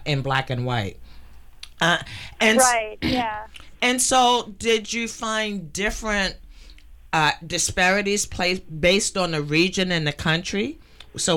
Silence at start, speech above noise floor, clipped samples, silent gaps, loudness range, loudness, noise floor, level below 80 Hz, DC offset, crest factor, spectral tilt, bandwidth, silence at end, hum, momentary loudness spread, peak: 0 s; 22 dB; under 0.1%; none; 3 LU; -21 LUFS; -44 dBFS; -42 dBFS; under 0.1%; 18 dB; -3 dB/octave; 18 kHz; 0 s; none; 10 LU; -6 dBFS